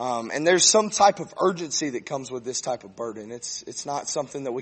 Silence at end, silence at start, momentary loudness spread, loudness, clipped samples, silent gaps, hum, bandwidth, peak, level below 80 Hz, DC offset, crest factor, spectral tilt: 0 s; 0 s; 15 LU; -24 LUFS; under 0.1%; none; none; 8.8 kHz; -4 dBFS; -68 dBFS; under 0.1%; 20 dB; -2 dB/octave